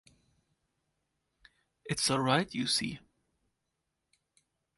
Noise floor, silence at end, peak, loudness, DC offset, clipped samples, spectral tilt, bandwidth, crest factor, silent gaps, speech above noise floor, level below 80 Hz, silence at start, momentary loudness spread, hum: -84 dBFS; 1.8 s; -12 dBFS; -30 LUFS; under 0.1%; under 0.1%; -3.5 dB/octave; 12 kHz; 26 dB; none; 53 dB; -68 dBFS; 1.85 s; 17 LU; none